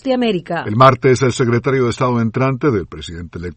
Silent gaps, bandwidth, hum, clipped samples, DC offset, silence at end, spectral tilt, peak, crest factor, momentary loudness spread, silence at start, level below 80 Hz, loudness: none; 8.8 kHz; none; under 0.1%; under 0.1%; 0.05 s; -6.5 dB/octave; 0 dBFS; 16 dB; 16 LU; 0.05 s; -44 dBFS; -15 LUFS